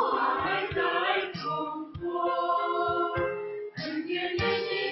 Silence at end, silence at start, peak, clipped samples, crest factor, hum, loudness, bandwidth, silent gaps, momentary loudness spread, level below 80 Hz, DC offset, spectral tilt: 0 s; 0 s; -12 dBFS; under 0.1%; 16 dB; none; -29 LUFS; 6 kHz; none; 8 LU; -54 dBFS; under 0.1%; -6.5 dB/octave